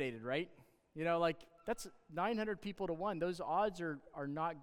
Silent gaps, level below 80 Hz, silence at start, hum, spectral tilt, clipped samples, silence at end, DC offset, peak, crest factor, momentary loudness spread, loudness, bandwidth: none; -68 dBFS; 0 s; none; -5.5 dB/octave; under 0.1%; 0 s; under 0.1%; -20 dBFS; 18 dB; 9 LU; -40 LUFS; 17.5 kHz